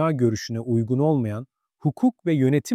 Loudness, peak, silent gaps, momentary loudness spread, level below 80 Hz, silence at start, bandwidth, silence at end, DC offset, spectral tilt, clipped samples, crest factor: -23 LUFS; -8 dBFS; none; 8 LU; -62 dBFS; 0 s; 14.5 kHz; 0 s; under 0.1%; -7.5 dB/octave; under 0.1%; 14 dB